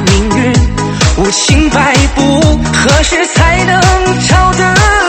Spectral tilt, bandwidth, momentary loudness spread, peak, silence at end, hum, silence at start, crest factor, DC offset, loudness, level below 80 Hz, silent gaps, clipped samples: -4.5 dB/octave; 11.5 kHz; 2 LU; 0 dBFS; 0 s; none; 0 s; 8 dB; under 0.1%; -8 LUFS; -16 dBFS; none; 0.8%